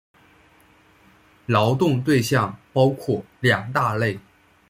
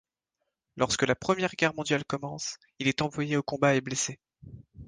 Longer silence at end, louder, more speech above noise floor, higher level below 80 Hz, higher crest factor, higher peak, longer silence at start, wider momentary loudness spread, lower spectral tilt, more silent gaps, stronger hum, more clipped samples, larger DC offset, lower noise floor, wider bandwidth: first, 0.5 s vs 0 s; first, -21 LUFS vs -29 LUFS; second, 35 dB vs 55 dB; about the same, -58 dBFS vs -60 dBFS; about the same, 20 dB vs 22 dB; first, -4 dBFS vs -8 dBFS; first, 1.5 s vs 0.75 s; about the same, 7 LU vs 9 LU; first, -6 dB/octave vs -4 dB/octave; neither; neither; neither; neither; second, -55 dBFS vs -83 dBFS; first, 16 kHz vs 10.5 kHz